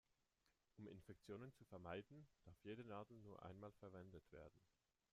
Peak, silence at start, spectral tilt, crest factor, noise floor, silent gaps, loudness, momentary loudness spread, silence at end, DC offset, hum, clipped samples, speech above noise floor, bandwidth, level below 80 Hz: -40 dBFS; 0.45 s; -7 dB/octave; 20 dB; -87 dBFS; none; -60 LUFS; 10 LU; 0.45 s; under 0.1%; none; under 0.1%; 28 dB; 11 kHz; -82 dBFS